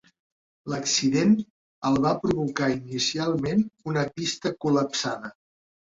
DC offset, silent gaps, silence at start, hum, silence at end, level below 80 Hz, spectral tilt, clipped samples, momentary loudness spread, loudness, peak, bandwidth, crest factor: under 0.1%; 1.50-1.82 s; 0.65 s; none; 0.65 s; -58 dBFS; -4.5 dB/octave; under 0.1%; 9 LU; -25 LUFS; -10 dBFS; 7.8 kHz; 16 dB